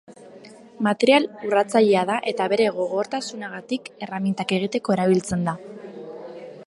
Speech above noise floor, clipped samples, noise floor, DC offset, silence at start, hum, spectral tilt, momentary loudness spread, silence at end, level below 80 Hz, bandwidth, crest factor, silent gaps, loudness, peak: 23 dB; under 0.1%; -45 dBFS; under 0.1%; 0.1 s; none; -5.5 dB/octave; 20 LU; 0 s; -60 dBFS; 11.5 kHz; 20 dB; none; -22 LUFS; -4 dBFS